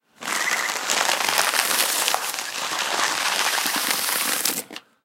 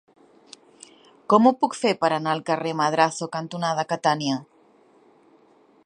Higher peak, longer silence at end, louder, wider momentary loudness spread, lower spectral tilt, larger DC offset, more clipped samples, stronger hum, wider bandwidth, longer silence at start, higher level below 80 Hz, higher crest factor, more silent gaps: about the same, 0 dBFS vs -2 dBFS; second, 0.25 s vs 1.4 s; about the same, -21 LUFS vs -23 LUFS; second, 7 LU vs 10 LU; second, 1 dB/octave vs -5 dB/octave; neither; neither; neither; first, 17 kHz vs 11 kHz; second, 0.2 s vs 1.3 s; about the same, -76 dBFS vs -76 dBFS; about the same, 24 dB vs 22 dB; neither